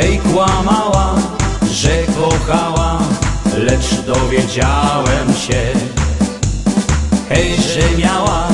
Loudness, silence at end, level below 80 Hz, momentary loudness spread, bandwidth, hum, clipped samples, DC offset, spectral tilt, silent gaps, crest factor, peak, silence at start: -14 LUFS; 0 s; -22 dBFS; 4 LU; 11.5 kHz; none; under 0.1%; under 0.1%; -5 dB/octave; none; 14 dB; 0 dBFS; 0 s